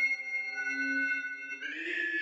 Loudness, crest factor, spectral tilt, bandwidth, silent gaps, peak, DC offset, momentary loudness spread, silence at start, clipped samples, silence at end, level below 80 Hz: -32 LUFS; 12 dB; -0.5 dB/octave; 10 kHz; none; -20 dBFS; under 0.1%; 8 LU; 0 s; under 0.1%; 0 s; under -90 dBFS